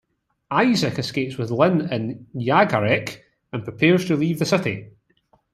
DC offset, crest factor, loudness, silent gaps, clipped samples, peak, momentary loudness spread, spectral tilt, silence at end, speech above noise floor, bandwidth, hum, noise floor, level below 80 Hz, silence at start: under 0.1%; 20 dB; -21 LUFS; none; under 0.1%; -2 dBFS; 13 LU; -6 dB/octave; 0.65 s; 42 dB; 14 kHz; none; -63 dBFS; -60 dBFS; 0.5 s